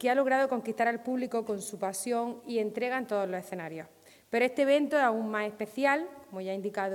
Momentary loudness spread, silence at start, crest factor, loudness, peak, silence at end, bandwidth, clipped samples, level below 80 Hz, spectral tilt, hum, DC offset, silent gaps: 12 LU; 0 s; 18 dB; -30 LUFS; -12 dBFS; 0 s; 17.5 kHz; under 0.1%; -80 dBFS; -4.5 dB/octave; none; under 0.1%; none